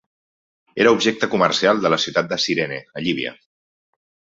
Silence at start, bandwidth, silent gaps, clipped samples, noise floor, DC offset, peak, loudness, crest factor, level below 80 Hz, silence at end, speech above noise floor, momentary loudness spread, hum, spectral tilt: 0.75 s; 7.8 kHz; none; under 0.1%; under -90 dBFS; under 0.1%; -2 dBFS; -19 LUFS; 20 dB; -62 dBFS; 1 s; over 71 dB; 10 LU; none; -4 dB/octave